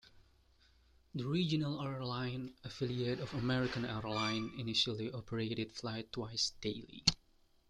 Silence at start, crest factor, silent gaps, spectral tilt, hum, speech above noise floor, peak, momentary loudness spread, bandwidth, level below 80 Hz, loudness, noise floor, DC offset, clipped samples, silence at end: 0.05 s; 26 dB; none; -4.5 dB/octave; none; 30 dB; -12 dBFS; 9 LU; 12 kHz; -62 dBFS; -38 LUFS; -68 dBFS; under 0.1%; under 0.1%; 0.55 s